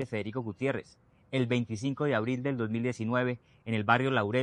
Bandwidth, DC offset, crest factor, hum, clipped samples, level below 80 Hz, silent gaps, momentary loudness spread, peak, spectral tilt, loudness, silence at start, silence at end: 9.8 kHz; under 0.1%; 22 dB; none; under 0.1%; -70 dBFS; none; 9 LU; -8 dBFS; -7 dB/octave; -31 LUFS; 0 s; 0 s